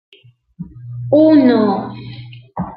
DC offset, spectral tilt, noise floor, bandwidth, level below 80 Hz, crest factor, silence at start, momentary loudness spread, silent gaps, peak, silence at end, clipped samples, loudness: under 0.1%; -11.5 dB/octave; -36 dBFS; 5 kHz; -50 dBFS; 14 dB; 0.6 s; 25 LU; none; -2 dBFS; 0 s; under 0.1%; -12 LUFS